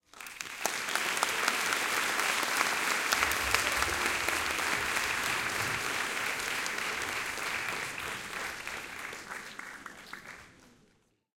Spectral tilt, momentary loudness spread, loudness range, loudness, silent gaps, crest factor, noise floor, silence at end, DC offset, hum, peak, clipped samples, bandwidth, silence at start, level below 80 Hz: -0.5 dB/octave; 15 LU; 10 LU; -30 LUFS; none; 28 dB; -69 dBFS; 0.7 s; under 0.1%; none; -6 dBFS; under 0.1%; 17 kHz; 0.15 s; -58 dBFS